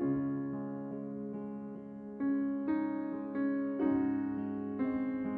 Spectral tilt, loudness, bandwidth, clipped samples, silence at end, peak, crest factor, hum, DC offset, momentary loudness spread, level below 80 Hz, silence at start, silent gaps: -11 dB/octave; -36 LUFS; 3.2 kHz; under 0.1%; 0 s; -22 dBFS; 14 dB; none; under 0.1%; 10 LU; -68 dBFS; 0 s; none